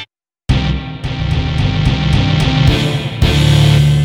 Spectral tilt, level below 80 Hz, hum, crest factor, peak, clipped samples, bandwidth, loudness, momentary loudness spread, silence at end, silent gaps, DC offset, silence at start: -6 dB/octave; -20 dBFS; none; 12 dB; 0 dBFS; under 0.1%; 13.5 kHz; -13 LUFS; 11 LU; 0 s; none; under 0.1%; 0 s